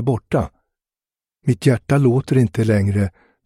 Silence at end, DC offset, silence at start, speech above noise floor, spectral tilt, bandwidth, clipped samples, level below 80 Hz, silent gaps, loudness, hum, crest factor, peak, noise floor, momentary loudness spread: 0.35 s; under 0.1%; 0 s; over 73 dB; -8 dB/octave; 12.5 kHz; under 0.1%; -44 dBFS; none; -18 LUFS; none; 16 dB; -2 dBFS; under -90 dBFS; 8 LU